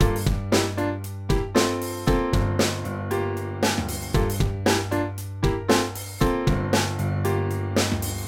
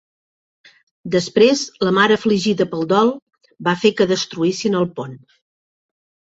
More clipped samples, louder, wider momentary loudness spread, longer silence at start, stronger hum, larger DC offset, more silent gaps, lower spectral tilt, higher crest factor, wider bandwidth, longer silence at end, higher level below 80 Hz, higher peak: neither; second, -24 LUFS vs -17 LUFS; second, 5 LU vs 10 LU; second, 0 s vs 1.05 s; neither; neither; second, none vs 3.22-3.27 s; about the same, -5 dB/octave vs -5 dB/octave; about the same, 16 dB vs 18 dB; first, 18 kHz vs 8 kHz; second, 0 s vs 1.2 s; first, -32 dBFS vs -60 dBFS; second, -6 dBFS vs -2 dBFS